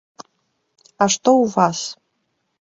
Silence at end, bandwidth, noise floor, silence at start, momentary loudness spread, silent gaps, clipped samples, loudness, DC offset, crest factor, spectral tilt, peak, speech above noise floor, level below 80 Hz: 0.85 s; 8 kHz; -71 dBFS; 1 s; 12 LU; none; under 0.1%; -17 LUFS; under 0.1%; 18 dB; -4 dB/octave; -2 dBFS; 54 dB; -64 dBFS